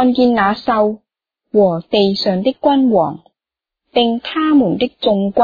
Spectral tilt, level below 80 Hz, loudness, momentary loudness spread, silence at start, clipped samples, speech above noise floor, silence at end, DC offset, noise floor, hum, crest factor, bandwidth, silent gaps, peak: -7.5 dB/octave; -50 dBFS; -15 LUFS; 6 LU; 0 s; under 0.1%; 73 dB; 0 s; under 0.1%; -87 dBFS; none; 14 dB; 5 kHz; none; -2 dBFS